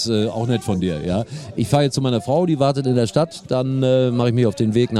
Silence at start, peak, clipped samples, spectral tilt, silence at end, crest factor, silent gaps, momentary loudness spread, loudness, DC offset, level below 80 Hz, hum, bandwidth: 0 s; -2 dBFS; under 0.1%; -6.5 dB/octave; 0 s; 16 dB; none; 6 LU; -19 LUFS; under 0.1%; -48 dBFS; none; 13 kHz